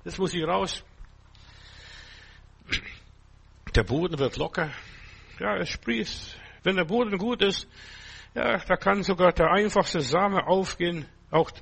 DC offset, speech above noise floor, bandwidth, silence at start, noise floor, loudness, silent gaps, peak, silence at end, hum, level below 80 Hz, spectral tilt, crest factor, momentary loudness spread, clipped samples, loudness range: under 0.1%; 28 dB; 8.4 kHz; 0.05 s; -54 dBFS; -26 LUFS; none; -6 dBFS; 0 s; none; -42 dBFS; -5 dB/octave; 22 dB; 22 LU; under 0.1%; 9 LU